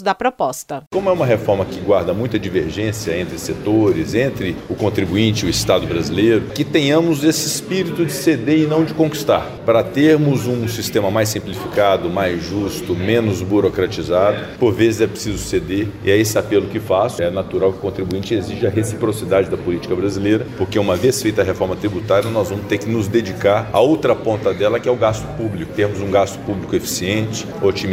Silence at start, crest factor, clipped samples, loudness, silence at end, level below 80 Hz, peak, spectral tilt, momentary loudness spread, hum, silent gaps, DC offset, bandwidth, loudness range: 0 s; 16 dB; under 0.1%; -18 LUFS; 0 s; -42 dBFS; -2 dBFS; -5.5 dB/octave; 7 LU; none; 0.87-0.91 s; under 0.1%; 16 kHz; 3 LU